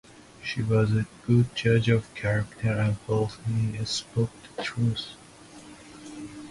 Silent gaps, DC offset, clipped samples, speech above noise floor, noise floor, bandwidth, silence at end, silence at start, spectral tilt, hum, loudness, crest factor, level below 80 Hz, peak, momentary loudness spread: none; under 0.1%; under 0.1%; 23 dB; -48 dBFS; 11.5 kHz; 0 s; 0.4 s; -6.5 dB/octave; none; -27 LUFS; 18 dB; -52 dBFS; -8 dBFS; 20 LU